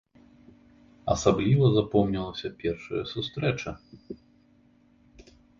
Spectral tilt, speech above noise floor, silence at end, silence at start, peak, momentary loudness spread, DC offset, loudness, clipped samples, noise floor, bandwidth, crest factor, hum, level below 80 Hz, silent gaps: -6.5 dB/octave; 35 dB; 1.45 s; 1.05 s; -8 dBFS; 23 LU; under 0.1%; -27 LUFS; under 0.1%; -61 dBFS; 7.6 kHz; 22 dB; none; -50 dBFS; none